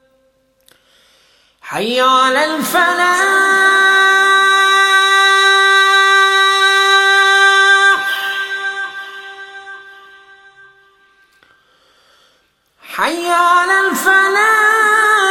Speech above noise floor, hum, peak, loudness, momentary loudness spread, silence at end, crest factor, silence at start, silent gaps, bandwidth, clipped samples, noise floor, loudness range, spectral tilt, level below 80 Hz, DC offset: 46 dB; none; 0 dBFS; -10 LUFS; 14 LU; 0 s; 12 dB; 1.65 s; none; 16.5 kHz; under 0.1%; -58 dBFS; 14 LU; 0 dB/octave; -64 dBFS; under 0.1%